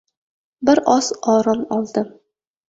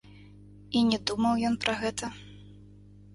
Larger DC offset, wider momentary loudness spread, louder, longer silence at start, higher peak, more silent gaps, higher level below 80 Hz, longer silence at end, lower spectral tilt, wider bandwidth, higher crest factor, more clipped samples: neither; second, 9 LU vs 15 LU; first, -18 LUFS vs -28 LUFS; first, 0.6 s vs 0.05 s; first, -2 dBFS vs -10 dBFS; neither; about the same, -58 dBFS vs -56 dBFS; about the same, 0.6 s vs 0.5 s; about the same, -4.5 dB/octave vs -4 dB/octave; second, 8 kHz vs 11.5 kHz; about the same, 18 dB vs 20 dB; neither